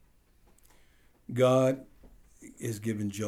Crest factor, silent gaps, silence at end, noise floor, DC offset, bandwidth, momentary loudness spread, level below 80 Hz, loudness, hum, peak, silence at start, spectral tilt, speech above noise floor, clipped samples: 18 dB; none; 0 s; -62 dBFS; under 0.1%; 16 kHz; 15 LU; -62 dBFS; -29 LUFS; none; -12 dBFS; 1.3 s; -6.5 dB/octave; 34 dB; under 0.1%